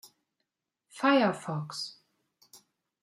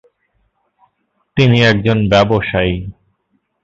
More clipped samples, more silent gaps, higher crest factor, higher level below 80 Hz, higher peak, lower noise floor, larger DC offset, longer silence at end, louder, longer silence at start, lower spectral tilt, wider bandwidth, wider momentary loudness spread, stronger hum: neither; neither; first, 20 dB vs 14 dB; second, -82 dBFS vs -36 dBFS; second, -14 dBFS vs 0 dBFS; first, -84 dBFS vs -65 dBFS; neither; second, 0.45 s vs 0.7 s; second, -29 LUFS vs -13 LUFS; second, 0.95 s vs 1.35 s; second, -5.5 dB/octave vs -7 dB/octave; first, 15 kHz vs 7.6 kHz; about the same, 14 LU vs 13 LU; neither